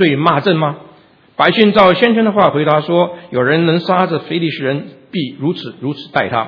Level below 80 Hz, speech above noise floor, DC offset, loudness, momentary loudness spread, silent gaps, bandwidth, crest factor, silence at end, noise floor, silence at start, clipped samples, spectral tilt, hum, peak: -54 dBFS; 32 dB; under 0.1%; -14 LUFS; 13 LU; none; 5.4 kHz; 14 dB; 0 s; -45 dBFS; 0 s; 0.2%; -8.5 dB/octave; none; 0 dBFS